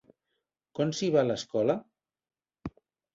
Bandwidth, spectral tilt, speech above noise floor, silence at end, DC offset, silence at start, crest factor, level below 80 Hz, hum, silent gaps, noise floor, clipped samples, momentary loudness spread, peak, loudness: 7.8 kHz; -5.5 dB/octave; 55 dB; 0.45 s; under 0.1%; 0.75 s; 20 dB; -64 dBFS; none; none; -83 dBFS; under 0.1%; 18 LU; -10 dBFS; -29 LUFS